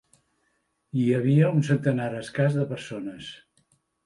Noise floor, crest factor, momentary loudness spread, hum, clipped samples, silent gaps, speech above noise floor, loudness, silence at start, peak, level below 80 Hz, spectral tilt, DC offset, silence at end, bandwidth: -73 dBFS; 16 dB; 15 LU; none; under 0.1%; none; 49 dB; -25 LUFS; 0.95 s; -10 dBFS; -68 dBFS; -8 dB/octave; under 0.1%; 0.7 s; 11.5 kHz